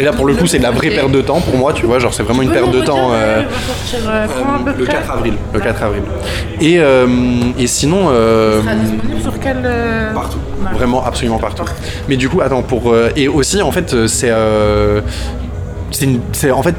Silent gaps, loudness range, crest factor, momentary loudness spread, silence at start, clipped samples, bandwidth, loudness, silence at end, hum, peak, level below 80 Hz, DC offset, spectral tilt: none; 4 LU; 12 dB; 8 LU; 0 s; under 0.1%; 19 kHz; -13 LUFS; 0 s; none; 0 dBFS; -26 dBFS; 0.2%; -5 dB/octave